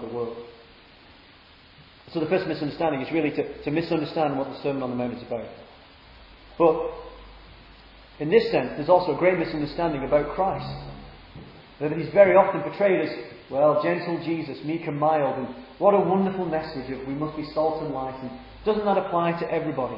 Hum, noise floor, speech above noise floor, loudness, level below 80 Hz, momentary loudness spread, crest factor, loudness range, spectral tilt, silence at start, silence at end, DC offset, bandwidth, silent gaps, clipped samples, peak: none; -52 dBFS; 28 dB; -24 LUFS; -52 dBFS; 14 LU; 22 dB; 7 LU; -9 dB/octave; 0 s; 0 s; under 0.1%; 5.8 kHz; none; under 0.1%; -4 dBFS